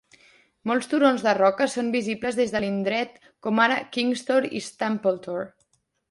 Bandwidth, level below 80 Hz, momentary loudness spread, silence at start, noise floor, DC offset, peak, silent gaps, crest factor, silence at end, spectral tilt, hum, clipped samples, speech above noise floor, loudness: 11.5 kHz; -64 dBFS; 12 LU; 0.65 s; -69 dBFS; under 0.1%; -6 dBFS; none; 20 dB; 0.6 s; -4.5 dB/octave; none; under 0.1%; 45 dB; -24 LUFS